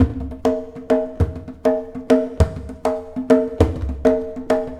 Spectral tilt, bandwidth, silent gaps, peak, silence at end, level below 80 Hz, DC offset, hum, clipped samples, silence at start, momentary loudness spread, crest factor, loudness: -8 dB/octave; 12.5 kHz; none; 0 dBFS; 0 s; -30 dBFS; under 0.1%; none; under 0.1%; 0 s; 7 LU; 20 dB; -21 LUFS